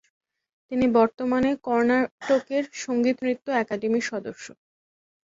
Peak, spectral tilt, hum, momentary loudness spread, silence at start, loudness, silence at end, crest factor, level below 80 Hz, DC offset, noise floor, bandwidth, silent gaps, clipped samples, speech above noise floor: -8 dBFS; -5 dB/octave; none; 10 LU; 0.7 s; -24 LUFS; 0.75 s; 18 dB; -60 dBFS; under 0.1%; under -90 dBFS; 7.8 kHz; 2.11-2.18 s; under 0.1%; over 66 dB